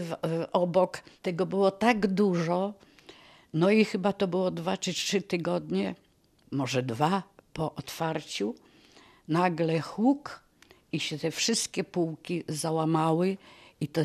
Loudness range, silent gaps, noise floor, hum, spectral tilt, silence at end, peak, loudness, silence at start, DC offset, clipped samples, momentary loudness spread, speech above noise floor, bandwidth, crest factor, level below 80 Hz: 4 LU; none; -63 dBFS; none; -5 dB/octave; 0 s; -10 dBFS; -29 LUFS; 0 s; under 0.1%; under 0.1%; 11 LU; 35 dB; 14.5 kHz; 20 dB; -66 dBFS